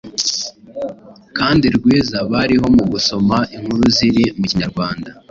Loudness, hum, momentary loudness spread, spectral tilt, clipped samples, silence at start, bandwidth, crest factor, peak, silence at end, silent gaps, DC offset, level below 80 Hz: -15 LUFS; none; 14 LU; -4.5 dB/octave; under 0.1%; 0.05 s; 7.6 kHz; 14 dB; -2 dBFS; 0.2 s; none; under 0.1%; -40 dBFS